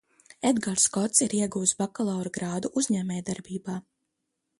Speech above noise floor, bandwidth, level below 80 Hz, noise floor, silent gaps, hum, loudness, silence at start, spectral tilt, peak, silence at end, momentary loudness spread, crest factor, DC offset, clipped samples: 54 dB; 11.5 kHz; -66 dBFS; -81 dBFS; none; none; -26 LUFS; 0.4 s; -4 dB/octave; -8 dBFS; 0.8 s; 12 LU; 22 dB; under 0.1%; under 0.1%